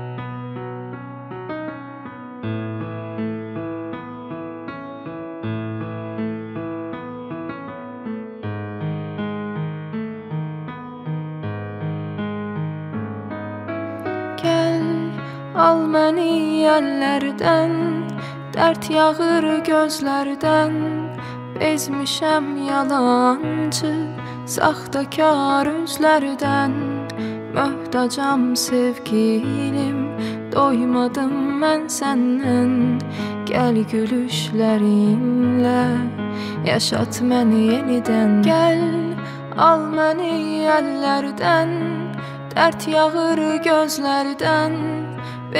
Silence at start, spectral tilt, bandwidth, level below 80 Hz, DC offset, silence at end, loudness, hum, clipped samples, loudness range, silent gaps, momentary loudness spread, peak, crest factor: 0 s; -5.5 dB/octave; 16 kHz; -60 dBFS; under 0.1%; 0 s; -20 LUFS; none; under 0.1%; 11 LU; none; 14 LU; -2 dBFS; 18 dB